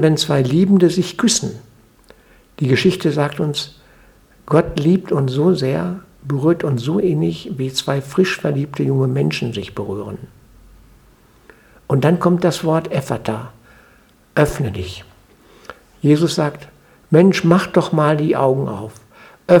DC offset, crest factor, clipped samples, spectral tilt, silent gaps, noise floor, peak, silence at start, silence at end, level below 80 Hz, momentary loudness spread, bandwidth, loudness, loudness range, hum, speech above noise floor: under 0.1%; 18 dB; under 0.1%; -6 dB/octave; none; -51 dBFS; 0 dBFS; 0 s; 0 s; -46 dBFS; 14 LU; 17.5 kHz; -17 LUFS; 6 LU; none; 35 dB